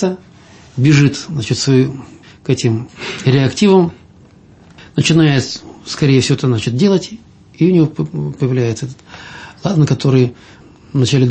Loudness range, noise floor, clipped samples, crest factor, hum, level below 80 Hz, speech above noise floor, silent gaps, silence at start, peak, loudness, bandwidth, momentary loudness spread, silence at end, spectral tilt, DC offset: 3 LU; -43 dBFS; under 0.1%; 14 dB; none; -48 dBFS; 30 dB; none; 0 s; 0 dBFS; -14 LUFS; 8.8 kHz; 17 LU; 0 s; -6 dB/octave; under 0.1%